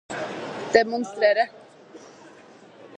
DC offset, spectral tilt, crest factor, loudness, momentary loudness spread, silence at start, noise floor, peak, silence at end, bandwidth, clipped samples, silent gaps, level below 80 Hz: under 0.1%; -4 dB/octave; 24 dB; -23 LUFS; 12 LU; 0.1 s; -49 dBFS; -2 dBFS; 0 s; 9.6 kHz; under 0.1%; none; -68 dBFS